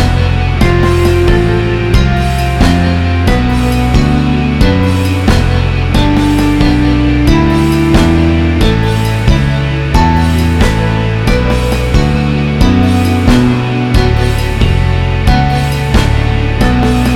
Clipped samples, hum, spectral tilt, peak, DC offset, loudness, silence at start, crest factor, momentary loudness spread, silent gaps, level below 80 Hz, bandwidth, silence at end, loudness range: 0.4%; none; -6.5 dB/octave; 0 dBFS; under 0.1%; -11 LUFS; 0 s; 8 dB; 3 LU; none; -14 dBFS; 15.5 kHz; 0 s; 1 LU